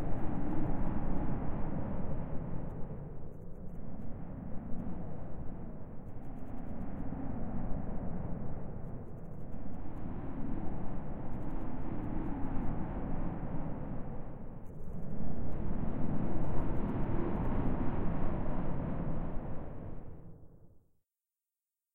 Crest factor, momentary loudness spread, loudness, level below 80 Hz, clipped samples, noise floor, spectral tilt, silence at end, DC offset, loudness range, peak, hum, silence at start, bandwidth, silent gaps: 14 dB; 11 LU; -41 LUFS; -40 dBFS; under 0.1%; under -90 dBFS; -11 dB/octave; 1.15 s; under 0.1%; 8 LU; -16 dBFS; none; 0 s; 2.9 kHz; none